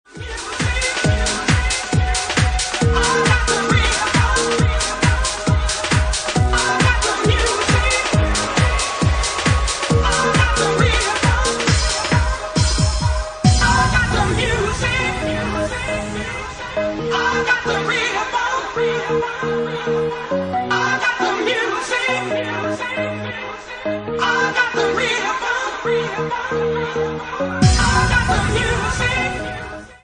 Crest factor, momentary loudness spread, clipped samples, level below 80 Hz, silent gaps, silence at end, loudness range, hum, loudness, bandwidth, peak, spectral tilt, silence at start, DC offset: 18 dB; 7 LU; under 0.1%; -26 dBFS; none; 0.1 s; 4 LU; none; -18 LUFS; 10.5 kHz; 0 dBFS; -4 dB/octave; 0.15 s; under 0.1%